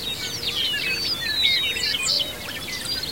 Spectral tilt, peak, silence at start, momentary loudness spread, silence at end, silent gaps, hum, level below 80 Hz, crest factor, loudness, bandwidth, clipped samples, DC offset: -0.5 dB/octave; -6 dBFS; 0 s; 9 LU; 0 s; none; none; -50 dBFS; 18 dB; -22 LUFS; 16.5 kHz; under 0.1%; 0.4%